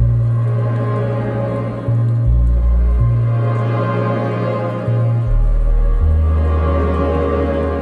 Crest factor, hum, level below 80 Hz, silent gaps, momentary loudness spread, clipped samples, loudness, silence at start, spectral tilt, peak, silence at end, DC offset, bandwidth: 10 dB; none; -18 dBFS; none; 4 LU; under 0.1%; -17 LUFS; 0 s; -10 dB/octave; -4 dBFS; 0 s; under 0.1%; 4.4 kHz